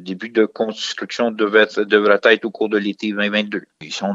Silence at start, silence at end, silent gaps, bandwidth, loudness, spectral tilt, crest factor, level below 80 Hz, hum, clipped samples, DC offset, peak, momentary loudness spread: 0 s; 0 s; none; 7.8 kHz; -18 LUFS; -4.5 dB/octave; 18 dB; -72 dBFS; none; under 0.1%; under 0.1%; 0 dBFS; 11 LU